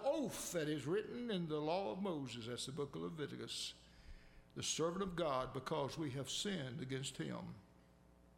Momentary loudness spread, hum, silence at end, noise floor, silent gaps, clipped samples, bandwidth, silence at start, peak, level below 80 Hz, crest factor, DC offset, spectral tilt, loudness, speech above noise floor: 9 LU; none; 0.1 s; -67 dBFS; none; under 0.1%; 16.5 kHz; 0 s; -26 dBFS; -66 dBFS; 16 dB; under 0.1%; -4.5 dB/octave; -43 LUFS; 24 dB